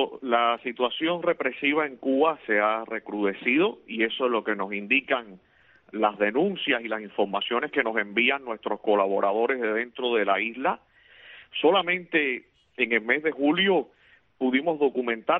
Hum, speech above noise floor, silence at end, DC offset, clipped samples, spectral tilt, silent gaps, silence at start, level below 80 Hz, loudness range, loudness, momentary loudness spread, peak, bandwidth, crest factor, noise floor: none; 25 dB; 0 s; under 0.1%; under 0.1%; -8 dB/octave; none; 0 s; -72 dBFS; 2 LU; -25 LUFS; 6 LU; -8 dBFS; 4.1 kHz; 18 dB; -51 dBFS